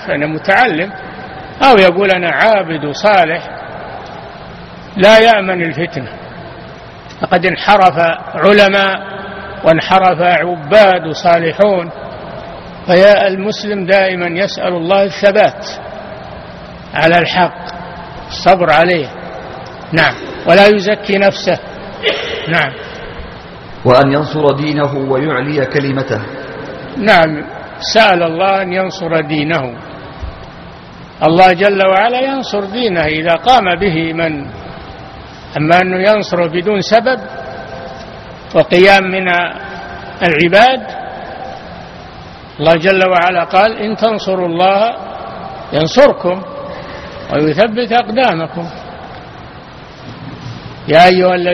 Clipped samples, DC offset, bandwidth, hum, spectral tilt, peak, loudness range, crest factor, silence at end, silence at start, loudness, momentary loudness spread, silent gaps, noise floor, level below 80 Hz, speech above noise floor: 0.4%; under 0.1%; 10.5 kHz; none; -5.5 dB/octave; 0 dBFS; 4 LU; 12 dB; 0 s; 0 s; -11 LUFS; 22 LU; none; -33 dBFS; -42 dBFS; 22 dB